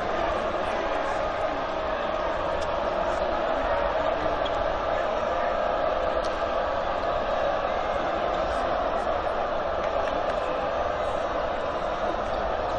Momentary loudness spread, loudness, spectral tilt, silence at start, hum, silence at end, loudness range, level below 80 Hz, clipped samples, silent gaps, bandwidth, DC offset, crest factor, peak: 2 LU; -27 LUFS; -5 dB/octave; 0 s; none; 0 s; 1 LU; -40 dBFS; under 0.1%; none; 9.6 kHz; under 0.1%; 12 dB; -14 dBFS